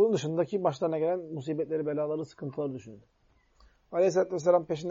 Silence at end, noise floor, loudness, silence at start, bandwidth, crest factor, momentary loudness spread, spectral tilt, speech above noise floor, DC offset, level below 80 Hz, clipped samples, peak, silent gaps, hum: 0 s; -62 dBFS; -30 LUFS; 0 s; 7.6 kHz; 18 dB; 10 LU; -6.5 dB/octave; 33 dB; under 0.1%; -68 dBFS; under 0.1%; -12 dBFS; none; none